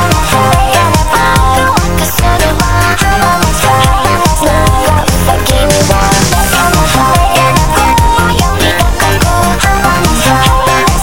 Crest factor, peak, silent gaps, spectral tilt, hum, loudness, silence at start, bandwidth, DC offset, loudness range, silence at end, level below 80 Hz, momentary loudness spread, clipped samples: 8 dB; 0 dBFS; none; -4 dB/octave; none; -8 LUFS; 0 s; 17.5 kHz; 6%; 1 LU; 0 s; -16 dBFS; 2 LU; 0.2%